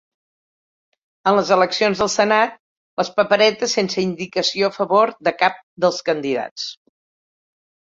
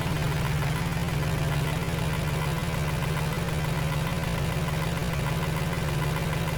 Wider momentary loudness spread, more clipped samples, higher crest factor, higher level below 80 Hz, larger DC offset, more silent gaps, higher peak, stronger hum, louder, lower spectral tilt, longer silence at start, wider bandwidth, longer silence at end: first, 8 LU vs 1 LU; neither; first, 20 dB vs 12 dB; second, -60 dBFS vs -36 dBFS; neither; first, 2.60-2.97 s, 5.63-5.77 s, 6.51-6.56 s vs none; first, 0 dBFS vs -16 dBFS; neither; first, -18 LUFS vs -28 LUFS; second, -3.5 dB/octave vs -5.5 dB/octave; first, 1.25 s vs 0 s; second, 7.8 kHz vs over 20 kHz; first, 1.1 s vs 0 s